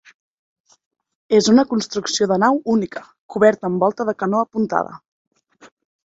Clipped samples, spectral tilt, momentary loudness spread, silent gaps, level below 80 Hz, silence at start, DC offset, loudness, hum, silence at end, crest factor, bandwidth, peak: under 0.1%; -4.5 dB/octave; 10 LU; 3.19-3.29 s, 5.08-5.31 s; -62 dBFS; 1.3 s; under 0.1%; -18 LUFS; none; 0.4 s; 18 dB; 8 kHz; -2 dBFS